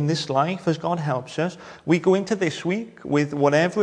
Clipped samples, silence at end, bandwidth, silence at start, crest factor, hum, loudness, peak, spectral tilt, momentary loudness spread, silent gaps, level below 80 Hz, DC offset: under 0.1%; 0 s; 10.5 kHz; 0 s; 18 dB; none; -23 LUFS; -4 dBFS; -6 dB/octave; 8 LU; none; -64 dBFS; under 0.1%